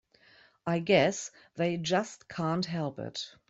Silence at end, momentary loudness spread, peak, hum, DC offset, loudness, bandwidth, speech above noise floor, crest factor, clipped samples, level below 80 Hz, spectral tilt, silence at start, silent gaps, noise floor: 0.2 s; 14 LU; -10 dBFS; none; under 0.1%; -31 LUFS; 8 kHz; 31 dB; 22 dB; under 0.1%; -68 dBFS; -5 dB/octave; 0.65 s; none; -61 dBFS